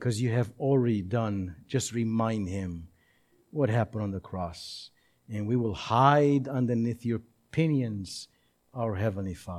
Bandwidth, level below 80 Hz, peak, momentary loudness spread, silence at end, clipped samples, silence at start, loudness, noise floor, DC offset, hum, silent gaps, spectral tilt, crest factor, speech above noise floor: 13 kHz; -58 dBFS; -8 dBFS; 15 LU; 0 s; under 0.1%; 0 s; -29 LUFS; -66 dBFS; under 0.1%; none; none; -6.5 dB/octave; 22 dB; 38 dB